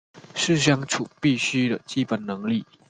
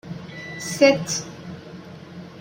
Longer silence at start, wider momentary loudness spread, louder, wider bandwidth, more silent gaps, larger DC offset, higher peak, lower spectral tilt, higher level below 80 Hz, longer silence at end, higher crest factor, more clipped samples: about the same, 0.15 s vs 0.05 s; second, 7 LU vs 23 LU; second, -24 LUFS vs -21 LUFS; second, 9.6 kHz vs 16 kHz; neither; neither; about the same, -4 dBFS vs -4 dBFS; about the same, -4.5 dB/octave vs -4 dB/octave; about the same, -62 dBFS vs -62 dBFS; first, 0.25 s vs 0 s; about the same, 20 dB vs 20 dB; neither